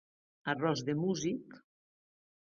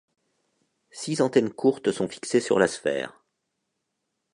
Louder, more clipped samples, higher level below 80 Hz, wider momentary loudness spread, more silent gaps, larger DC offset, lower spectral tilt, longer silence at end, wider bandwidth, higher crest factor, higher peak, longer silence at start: second, -35 LUFS vs -25 LUFS; neither; second, -74 dBFS vs -68 dBFS; about the same, 9 LU vs 9 LU; neither; neither; about the same, -5 dB/octave vs -5 dB/octave; second, 0.85 s vs 1.25 s; second, 7.4 kHz vs 11 kHz; about the same, 20 dB vs 22 dB; second, -18 dBFS vs -6 dBFS; second, 0.45 s vs 0.95 s